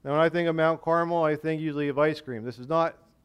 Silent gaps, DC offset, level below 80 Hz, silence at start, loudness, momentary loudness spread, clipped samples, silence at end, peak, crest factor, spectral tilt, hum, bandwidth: none; under 0.1%; -64 dBFS; 0.05 s; -26 LUFS; 7 LU; under 0.1%; 0.35 s; -10 dBFS; 16 dB; -7.5 dB/octave; none; 11.5 kHz